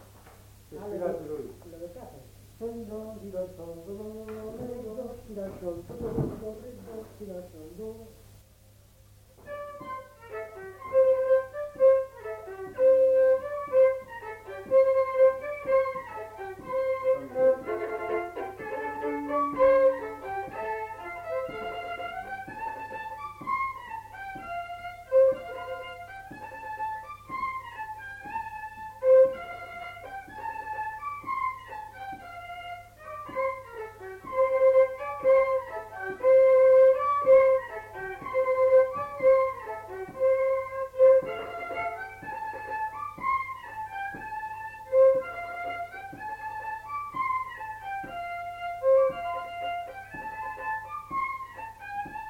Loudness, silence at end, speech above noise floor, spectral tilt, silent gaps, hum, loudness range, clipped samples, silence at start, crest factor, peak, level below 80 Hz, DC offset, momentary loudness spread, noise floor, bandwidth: -27 LUFS; 0 s; 19 dB; -6 dB/octave; none; 50 Hz at -65 dBFS; 16 LU; under 0.1%; 0 s; 18 dB; -10 dBFS; -58 dBFS; under 0.1%; 19 LU; -56 dBFS; 6.2 kHz